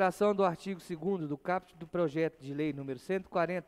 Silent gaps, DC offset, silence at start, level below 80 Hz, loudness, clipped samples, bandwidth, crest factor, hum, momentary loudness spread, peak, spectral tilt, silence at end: none; under 0.1%; 0 s; -68 dBFS; -34 LUFS; under 0.1%; 15 kHz; 18 dB; none; 10 LU; -16 dBFS; -7 dB/octave; 0.05 s